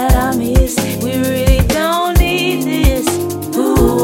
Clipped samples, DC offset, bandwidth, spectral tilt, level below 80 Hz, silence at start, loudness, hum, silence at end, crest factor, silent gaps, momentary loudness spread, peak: under 0.1%; under 0.1%; 17 kHz; -5 dB/octave; -18 dBFS; 0 s; -14 LUFS; none; 0 s; 12 dB; none; 4 LU; 0 dBFS